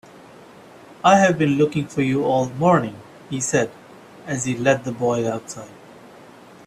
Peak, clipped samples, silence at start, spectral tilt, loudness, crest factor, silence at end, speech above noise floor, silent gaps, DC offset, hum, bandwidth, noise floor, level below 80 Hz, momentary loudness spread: -2 dBFS; under 0.1%; 0.9 s; -5.5 dB/octave; -20 LUFS; 20 dB; 0.6 s; 25 dB; none; under 0.1%; none; 13.5 kHz; -45 dBFS; -58 dBFS; 17 LU